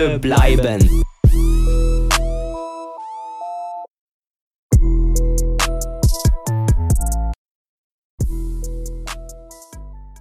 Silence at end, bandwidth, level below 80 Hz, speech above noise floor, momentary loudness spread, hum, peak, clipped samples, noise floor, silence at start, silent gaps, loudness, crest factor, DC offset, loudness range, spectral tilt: 0 s; 15.5 kHz; -18 dBFS; 25 dB; 19 LU; none; 0 dBFS; under 0.1%; -37 dBFS; 0 s; 3.90-4.34 s, 4.41-4.70 s, 7.36-8.18 s; -19 LUFS; 16 dB; under 0.1%; 6 LU; -5.5 dB/octave